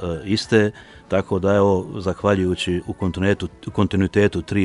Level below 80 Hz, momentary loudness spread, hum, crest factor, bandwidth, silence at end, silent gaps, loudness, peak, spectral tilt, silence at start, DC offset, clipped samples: -44 dBFS; 7 LU; none; 18 dB; 11.5 kHz; 0 s; none; -21 LUFS; -2 dBFS; -6.5 dB/octave; 0 s; under 0.1%; under 0.1%